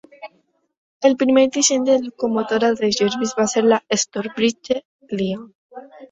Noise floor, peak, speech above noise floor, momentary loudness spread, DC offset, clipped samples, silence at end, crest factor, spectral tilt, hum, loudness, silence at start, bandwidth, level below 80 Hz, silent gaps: -63 dBFS; -2 dBFS; 45 dB; 10 LU; under 0.1%; under 0.1%; 0.05 s; 18 dB; -3.5 dB/octave; none; -19 LUFS; 0.2 s; 8.4 kHz; -62 dBFS; 0.77-1.00 s, 4.85-4.99 s, 5.55-5.69 s